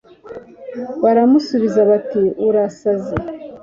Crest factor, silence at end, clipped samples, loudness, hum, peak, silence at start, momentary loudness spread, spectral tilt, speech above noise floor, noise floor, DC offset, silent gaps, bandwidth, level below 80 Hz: 14 dB; 0.05 s; under 0.1%; -16 LUFS; none; -2 dBFS; 0.25 s; 20 LU; -7.5 dB/octave; 21 dB; -36 dBFS; under 0.1%; none; 7.4 kHz; -48 dBFS